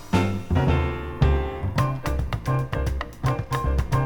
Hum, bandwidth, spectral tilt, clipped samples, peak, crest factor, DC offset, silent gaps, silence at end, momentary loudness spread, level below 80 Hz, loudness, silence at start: none; 19.5 kHz; -7 dB/octave; under 0.1%; -6 dBFS; 18 dB; under 0.1%; none; 0 s; 5 LU; -28 dBFS; -25 LUFS; 0 s